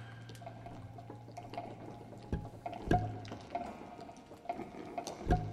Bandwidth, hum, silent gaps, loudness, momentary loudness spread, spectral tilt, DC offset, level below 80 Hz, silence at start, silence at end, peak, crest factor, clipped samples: 13.5 kHz; none; none; -42 LUFS; 15 LU; -7 dB/octave; under 0.1%; -48 dBFS; 0 s; 0 s; -16 dBFS; 26 dB; under 0.1%